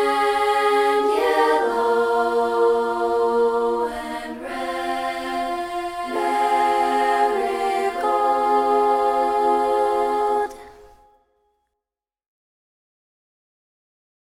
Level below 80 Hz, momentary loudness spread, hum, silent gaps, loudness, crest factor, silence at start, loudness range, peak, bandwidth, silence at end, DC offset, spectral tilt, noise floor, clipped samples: -54 dBFS; 8 LU; none; none; -20 LUFS; 16 dB; 0 s; 5 LU; -6 dBFS; 16 kHz; 3.55 s; under 0.1%; -3 dB/octave; -88 dBFS; under 0.1%